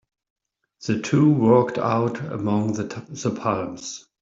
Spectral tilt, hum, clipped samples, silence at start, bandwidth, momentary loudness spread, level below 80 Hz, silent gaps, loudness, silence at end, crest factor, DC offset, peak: -6.5 dB/octave; none; under 0.1%; 0.8 s; 7.8 kHz; 14 LU; -60 dBFS; none; -22 LUFS; 0.2 s; 18 dB; under 0.1%; -4 dBFS